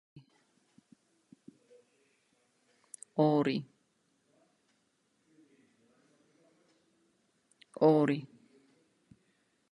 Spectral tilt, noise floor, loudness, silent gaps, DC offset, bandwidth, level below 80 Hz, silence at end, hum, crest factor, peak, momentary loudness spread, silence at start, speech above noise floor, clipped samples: -7 dB/octave; -76 dBFS; -30 LUFS; none; under 0.1%; 11.5 kHz; -82 dBFS; 1.45 s; none; 24 dB; -12 dBFS; 27 LU; 0.15 s; 48 dB; under 0.1%